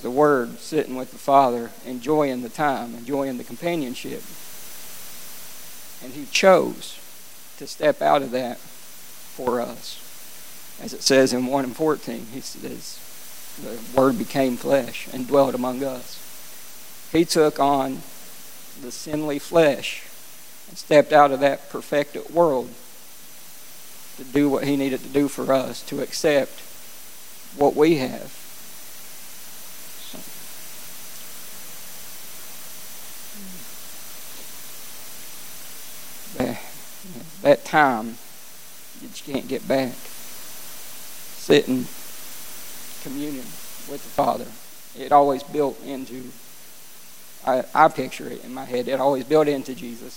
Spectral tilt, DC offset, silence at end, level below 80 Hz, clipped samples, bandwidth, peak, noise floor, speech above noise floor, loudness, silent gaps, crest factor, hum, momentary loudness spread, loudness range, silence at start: -4.5 dB/octave; 1%; 0 s; -58 dBFS; under 0.1%; 17 kHz; -2 dBFS; -45 dBFS; 24 dB; -22 LUFS; none; 22 dB; none; 21 LU; 15 LU; 0 s